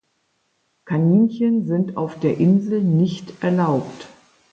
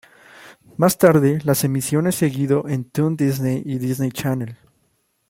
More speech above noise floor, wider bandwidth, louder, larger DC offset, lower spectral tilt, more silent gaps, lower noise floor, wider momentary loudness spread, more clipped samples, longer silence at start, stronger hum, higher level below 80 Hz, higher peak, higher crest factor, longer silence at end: about the same, 50 dB vs 48 dB; second, 7.6 kHz vs 16.5 kHz; about the same, -19 LUFS vs -19 LUFS; neither; first, -9 dB/octave vs -6 dB/octave; neither; about the same, -68 dBFS vs -66 dBFS; about the same, 9 LU vs 10 LU; neither; first, 0.85 s vs 0.4 s; neither; second, -64 dBFS vs -56 dBFS; second, -6 dBFS vs -2 dBFS; about the same, 14 dB vs 18 dB; second, 0.45 s vs 0.75 s